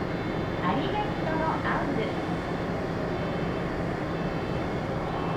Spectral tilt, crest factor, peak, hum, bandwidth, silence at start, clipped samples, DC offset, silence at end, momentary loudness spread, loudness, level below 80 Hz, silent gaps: -7 dB/octave; 14 dB; -14 dBFS; none; 14 kHz; 0 s; under 0.1%; under 0.1%; 0 s; 3 LU; -29 LUFS; -44 dBFS; none